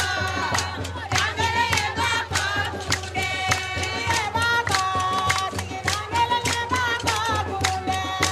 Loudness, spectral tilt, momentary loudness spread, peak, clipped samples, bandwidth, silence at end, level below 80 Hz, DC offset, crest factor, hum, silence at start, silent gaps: -23 LUFS; -2.5 dB/octave; 4 LU; -4 dBFS; under 0.1%; 15 kHz; 0 s; -44 dBFS; under 0.1%; 20 dB; none; 0 s; none